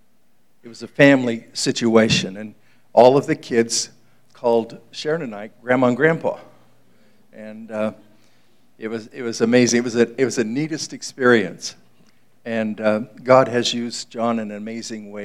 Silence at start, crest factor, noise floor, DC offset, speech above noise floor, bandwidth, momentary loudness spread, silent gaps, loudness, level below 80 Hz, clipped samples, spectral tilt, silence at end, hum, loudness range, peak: 0.65 s; 20 dB; -64 dBFS; 0.3%; 45 dB; 13.5 kHz; 18 LU; none; -19 LUFS; -62 dBFS; under 0.1%; -4.5 dB/octave; 0 s; none; 6 LU; 0 dBFS